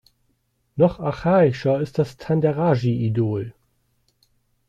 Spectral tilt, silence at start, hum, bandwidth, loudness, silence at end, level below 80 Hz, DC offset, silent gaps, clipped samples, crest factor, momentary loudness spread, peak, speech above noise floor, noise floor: -9 dB/octave; 0.75 s; none; 9.2 kHz; -21 LUFS; 1.2 s; -52 dBFS; under 0.1%; none; under 0.1%; 18 dB; 8 LU; -4 dBFS; 49 dB; -68 dBFS